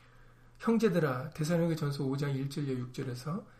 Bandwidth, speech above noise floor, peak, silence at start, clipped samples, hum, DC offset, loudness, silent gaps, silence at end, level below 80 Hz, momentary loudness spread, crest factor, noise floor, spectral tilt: 15.5 kHz; 25 dB; -16 dBFS; 0.2 s; under 0.1%; none; under 0.1%; -33 LUFS; none; 0.15 s; -60 dBFS; 9 LU; 18 dB; -57 dBFS; -7 dB/octave